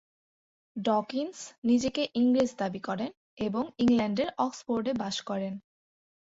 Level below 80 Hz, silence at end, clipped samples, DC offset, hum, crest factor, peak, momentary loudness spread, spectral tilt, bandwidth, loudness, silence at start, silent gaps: -64 dBFS; 0.6 s; under 0.1%; under 0.1%; none; 16 dB; -14 dBFS; 10 LU; -5 dB/octave; 8 kHz; -30 LUFS; 0.75 s; 1.58-1.62 s, 3.17-3.37 s